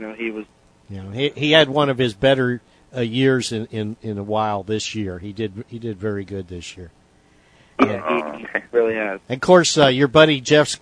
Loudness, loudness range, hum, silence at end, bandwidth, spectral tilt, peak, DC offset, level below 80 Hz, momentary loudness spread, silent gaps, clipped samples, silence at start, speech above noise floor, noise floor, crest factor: -19 LUFS; 9 LU; none; 0.05 s; 10.5 kHz; -4.5 dB/octave; 0 dBFS; under 0.1%; -52 dBFS; 17 LU; none; under 0.1%; 0 s; 35 dB; -55 dBFS; 20 dB